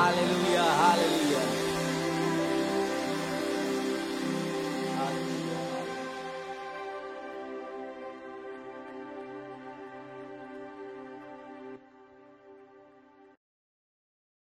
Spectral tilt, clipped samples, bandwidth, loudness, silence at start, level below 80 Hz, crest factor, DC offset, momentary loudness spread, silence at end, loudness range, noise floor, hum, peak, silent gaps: -4.5 dB/octave; under 0.1%; 16 kHz; -30 LUFS; 0 s; -66 dBFS; 22 dB; under 0.1%; 19 LU; 1.15 s; 19 LU; -57 dBFS; none; -10 dBFS; none